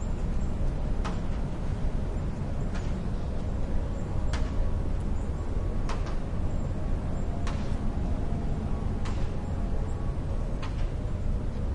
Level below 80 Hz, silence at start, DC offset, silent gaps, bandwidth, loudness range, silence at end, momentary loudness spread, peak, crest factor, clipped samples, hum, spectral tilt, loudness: -30 dBFS; 0 s; under 0.1%; none; 9.6 kHz; 1 LU; 0 s; 2 LU; -16 dBFS; 12 dB; under 0.1%; none; -7.5 dB/octave; -33 LUFS